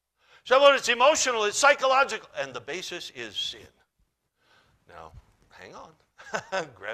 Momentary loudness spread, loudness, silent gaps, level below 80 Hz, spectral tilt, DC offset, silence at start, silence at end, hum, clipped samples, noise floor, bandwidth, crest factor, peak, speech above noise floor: 16 LU; -24 LUFS; none; -66 dBFS; -0.5 dB/octave; under 0.1%; 0.45 s; 0 s; none; under 0.1%; -73 dBFS; 14.5 kHz; 22 dB; -6 dBFS; 48 dB